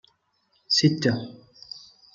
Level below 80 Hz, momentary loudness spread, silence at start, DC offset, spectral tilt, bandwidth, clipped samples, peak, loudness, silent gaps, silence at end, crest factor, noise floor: -68 dBFS; 21 LU; 0.7 s; under 0.1%; -4.5 dB/octave; 7.6 kHz; under 0.1%; -6 dBFS; -23 LUFS; none; 0.35 s; 22 dB; -69 dBFS